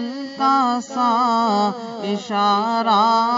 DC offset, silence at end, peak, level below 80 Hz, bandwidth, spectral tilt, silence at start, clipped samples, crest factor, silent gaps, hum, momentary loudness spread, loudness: under 0.1%; 0 s; -4 dBFS; -72 dBFS; 7.8 kHz; -5 dB/octave; 0 s; under 0.1%; 16 dB; none; none; 10 LU; -19 LUFS